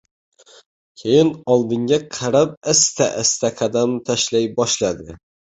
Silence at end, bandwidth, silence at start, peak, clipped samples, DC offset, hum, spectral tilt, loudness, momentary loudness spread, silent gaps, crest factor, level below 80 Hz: 0.45 s; 8.4 kHz; 1 s; -2 dBFS; under 0.1%; under 0.1%; none; -3.5 dB/octave; -18 LUFS; 5 LU; 2.57-2.61 s; 18 dB; -54 dBFS